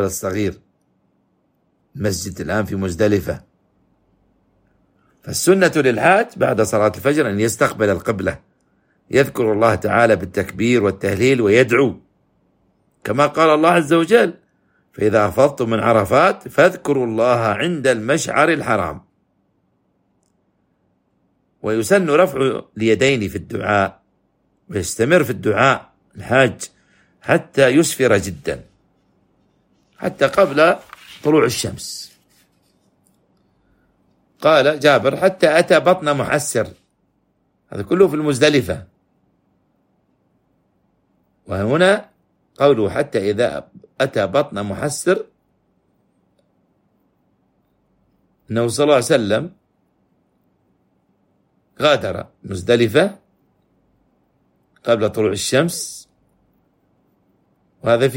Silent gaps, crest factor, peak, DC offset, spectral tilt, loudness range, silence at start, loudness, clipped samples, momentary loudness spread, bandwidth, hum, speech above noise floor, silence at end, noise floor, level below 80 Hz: none; 18 dB; 0 dBFS; under 0.1%; -5 dB/octave; 7 LU; 0 s; -17 LUFS; under 0.1%; 13 LU; 16.5 kHz; none; 48 dB; 0 s; -65 dBFS; -52 dBFS